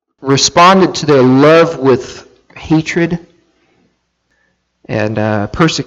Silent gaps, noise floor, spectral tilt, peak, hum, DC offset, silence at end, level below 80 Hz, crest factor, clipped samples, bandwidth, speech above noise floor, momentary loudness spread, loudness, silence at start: none; -62 dBFS; -5 dB/octave; 0 dBFS; none; under 0.1%; 0.05 s; -42 dBFS; 12 dB; under 0.1%; 10 kHz; 52 dB; 11 LU; -10 LUFS; 0.2 s